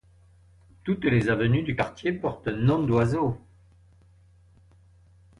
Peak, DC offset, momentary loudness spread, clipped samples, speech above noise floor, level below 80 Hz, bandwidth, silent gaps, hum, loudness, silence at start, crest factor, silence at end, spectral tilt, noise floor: -8 dBFS; under 0.1%; 7 LU; under 0.1%; 32 dB; -50 dBFS; 10.5 kHz; none; none; -25 LUFS; 0.85 s; 18 dB; 2.05 s; -8 dB/octave; -57 dBFS